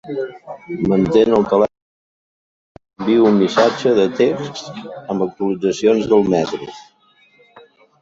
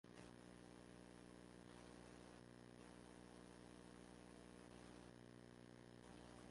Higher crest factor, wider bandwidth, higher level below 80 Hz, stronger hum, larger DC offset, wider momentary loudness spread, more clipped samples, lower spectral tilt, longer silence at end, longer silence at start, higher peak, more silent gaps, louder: about the same, 16 dB vs 16 dB; second, 7.8 kHz vs 11.5 kHz; first, -52 dBFS vs -76 dBFS; second, none vs 60 Hz at -65 dBFS; neither; first, 16 LU vs 2 LU; neither; first, -6.5 dB/octave vs -5 dB/octave; first, 1.2 s vs 0 s; about the same, 0.05 s vs 0.05 s; first, -2 dBFS vs -46 dBFS; first, 1.82-2.75 s vs none; first, -16 LUFS vs -63 LUFS